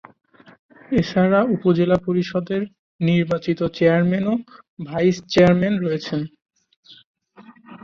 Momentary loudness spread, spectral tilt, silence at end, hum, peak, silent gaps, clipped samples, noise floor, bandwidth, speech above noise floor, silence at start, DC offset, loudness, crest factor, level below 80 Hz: 11 LU; -7.5 dB/octave; 0.1 s; none; -2 dBFS; 2.79-2.99 s, 4.68-4.77 s, 6.77-6.83 s, 7.06-7.14 s; under 0.1%; -48 dBFS; 7 kHz; 29 dB; 0.9 s; under 0.1%; -20 LUFS; 18 dB; -52 dBFS